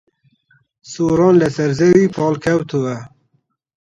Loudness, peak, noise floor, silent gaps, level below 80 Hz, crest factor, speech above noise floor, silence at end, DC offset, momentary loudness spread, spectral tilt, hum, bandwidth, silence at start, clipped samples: -15 LUFS; 0 dBFS; -65 dBFS; none; -50 dBFS; 16 dB; 50 dB; 0.8 s; under 0.1%; 11 LU; -7 dB/octave; none; 8.8 kHz; 0.9 s; under 0.1%